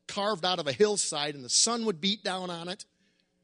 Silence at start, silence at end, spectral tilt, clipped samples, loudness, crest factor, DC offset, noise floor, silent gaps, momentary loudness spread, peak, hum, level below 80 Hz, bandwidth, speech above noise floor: 0.1 s; 0.6 s; -2 dB/octave; under 0.1%; -28 LUFS; 20 dB; under 0.1%; -71 dBFS; none; 13 LU; -10 dBFS; none; -74 dBFS; 10.5 kHz; 42 dB